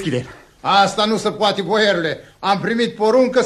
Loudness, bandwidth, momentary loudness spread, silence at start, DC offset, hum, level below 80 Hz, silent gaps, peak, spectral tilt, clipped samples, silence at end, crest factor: -17 LUFS; 12.5 kHz; 10 LU; 0 s; under 0.1%; none; -54 dBFS; none; -2 dBFS; -4.5 dB/octave; under 0.1%; 0 s; 16 dB